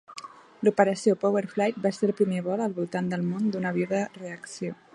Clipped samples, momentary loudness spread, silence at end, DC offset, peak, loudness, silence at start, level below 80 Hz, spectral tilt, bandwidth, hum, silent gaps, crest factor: under 0.1%; 14 LU; 0.2 s; under 0.1%; -4 dBFS; -27 LUFS; 0.1 s; -74 dBFS; -6.5 dB/octave; 11 kHz; none; none; 22 dB